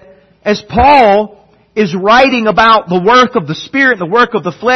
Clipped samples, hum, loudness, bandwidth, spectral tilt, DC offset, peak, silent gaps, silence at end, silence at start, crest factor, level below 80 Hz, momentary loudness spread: 0.1%; none; -9 LUFS; 9.4 kHz; -5 dB/octave; under 0.1%; 0 dBFS; none; 0 s; 0.45 s; 10 dB; -36 dBFS; 10 LU